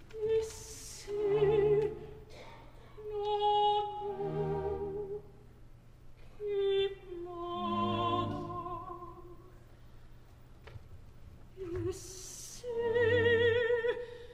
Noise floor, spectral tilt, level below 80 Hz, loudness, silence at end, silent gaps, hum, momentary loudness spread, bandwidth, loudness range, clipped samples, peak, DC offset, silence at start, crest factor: -54 dBFS; -5 dB/octave; -54 dBFS; -33 LUFS; 0 s; none; none; 23 LU; 15.5 kHz; 13 LU; under 0.1%; -18 dBFS; under 0.1%; 0 s; 16 dB